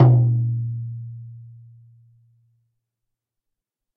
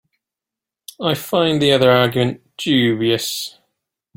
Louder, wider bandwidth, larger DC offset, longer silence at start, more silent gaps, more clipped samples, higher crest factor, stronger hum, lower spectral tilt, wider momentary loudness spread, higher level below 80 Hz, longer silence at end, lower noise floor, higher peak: second, -22 LUFS vs -17 LUFS; second, 2 kHz vs 17 kHz; neither; second, 0 s vs 1 s; neither; neither; about the same, 20 dB vs 18 dB; neither; first, -11.5 dB/octave vs -5 dB/octave; first, 25 LU vs 11 LU; about the same, -58 dBFS vs -56 dBFS; first, 2.45 s vs 0.7 s; second, -83 dBFS vs -87 dBFS; about the same, -2 dBFS vs 0 dBFS